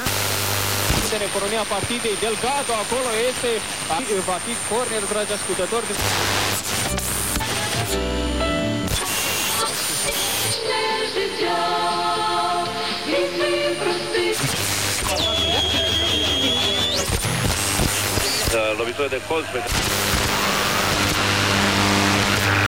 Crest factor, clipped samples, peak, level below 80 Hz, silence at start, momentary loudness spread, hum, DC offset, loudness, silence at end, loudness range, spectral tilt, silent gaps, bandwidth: 16 dB; under 0.1%; -4 dBFS; -36 dBFS; 0 s; 5 LU; none; 0.6%; -20 LUFS; 0 s; 3 LU; -2.5 dB/octave; none; 16 kHz